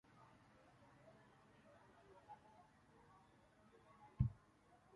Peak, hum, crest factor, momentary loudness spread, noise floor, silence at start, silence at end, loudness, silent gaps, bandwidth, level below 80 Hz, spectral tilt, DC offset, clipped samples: -24 dBFS; none; 28 dB; 25 LU; -72 dBFS; 0.2 s; 0.6 s; -48 LUFS; none; 10.5 kHz; -62 dBFS; -9 dB/octave; under 0.1%; under 0.1%